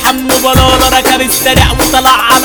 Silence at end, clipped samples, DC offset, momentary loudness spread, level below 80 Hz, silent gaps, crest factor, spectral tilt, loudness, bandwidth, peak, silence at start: 0 s; 2%; under 0.1%; 2 LU; -20 dBFS; none; 8 dB; -3 dB/octave; -7 LUFS; over 20 kHz; 0 dBFS; 0 s